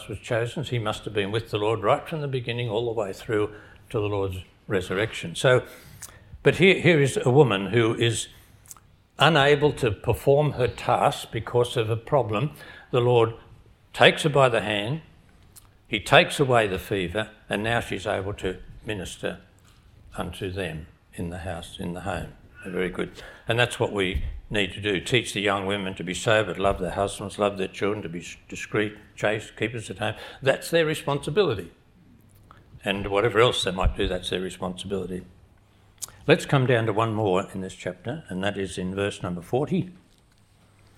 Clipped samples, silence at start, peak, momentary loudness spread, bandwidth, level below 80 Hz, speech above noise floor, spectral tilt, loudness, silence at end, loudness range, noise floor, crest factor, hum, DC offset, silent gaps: under 0.1%; 0 s; 0 dBFS; 15 LU; 16.5 kHz; -44 dBFS; 34 dB; -5 dB/octave; -25 LUFS; 1.05 s; 8 LU; -58 dBFS; 26 dB; none; under 0.1%; none